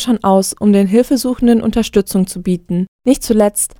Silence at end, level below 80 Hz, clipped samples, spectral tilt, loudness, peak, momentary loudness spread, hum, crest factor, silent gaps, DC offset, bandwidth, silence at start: 0.15 s; -38 dBFS; under 0.1%; -5.5 dB/octave; -14 LUFS; 0 dBFS; 6 LU; none; 14 dB; 2.88-2.99 s; under 0.1%; 18.5 kHz; 0 s